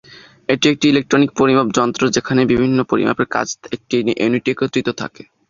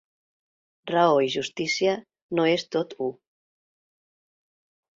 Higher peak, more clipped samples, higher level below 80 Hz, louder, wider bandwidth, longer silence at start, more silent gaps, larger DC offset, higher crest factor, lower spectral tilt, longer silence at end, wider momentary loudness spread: first, -2 dBFS vs -6 dBFS; neither; first, -50 dBFS vs -70 dBFS; first, -16 LUFS vs -25 LUFS; about the same, 7.4 kHz vs 7.8 kHz; second, 0.1 s vs 0.85 s; second, none vs 2.22-2.29 s; neither; about the same, 16 dB vs 20 dB; about the same, -5 dB/octave vs -4.5 dB/octave; second, 0.25 s vs 1.85 s; about the same, 10 LU vs 12 LU